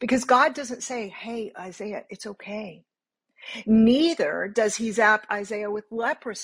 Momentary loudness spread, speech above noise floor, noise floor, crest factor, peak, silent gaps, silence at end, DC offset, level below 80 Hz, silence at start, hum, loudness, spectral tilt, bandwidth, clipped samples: 17 LU; 53 dB; -78 dBFS; 18 dB; -6 dBFS; none; 0 s; under 0.1%; -62 dBFS; 0 s; none; -23 LUFS; -4 dB/octave; 11 kHz; under 0.1%